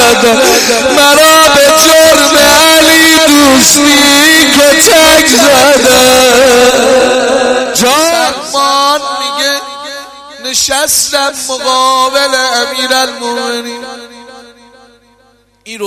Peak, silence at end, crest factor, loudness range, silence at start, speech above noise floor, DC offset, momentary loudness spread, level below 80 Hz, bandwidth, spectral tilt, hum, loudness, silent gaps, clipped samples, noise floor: 0 dBFS; 0 s; 8 dB; 8 LU; 0 s; 40 dB; under 0.1%; 11 LU; -38 dBFS; over 20 kHz; -1 dB/octave; none; -5 LUFS; none; 2%; -48 dBFS